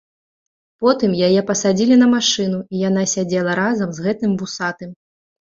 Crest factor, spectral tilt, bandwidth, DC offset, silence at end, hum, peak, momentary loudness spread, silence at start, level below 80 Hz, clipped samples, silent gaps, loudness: 16 dB; -4.5 dB/octave; 7.8 kHz; under 0.1%; 0.55 s; none; -2 dBFS; 10 LU; 0.8 s; -58 dBFS; under 0.1%; none; -17 LUFS